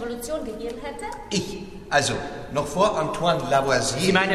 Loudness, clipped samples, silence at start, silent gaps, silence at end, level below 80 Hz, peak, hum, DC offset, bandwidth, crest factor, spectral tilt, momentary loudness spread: -24 LUFS; under 0.1%; 0 s; none; 0 s; -46 dBFS; -6 dBFS; none; under 0.1%; 14 kHz; 18 dB; -4 dB/octave; 13 LU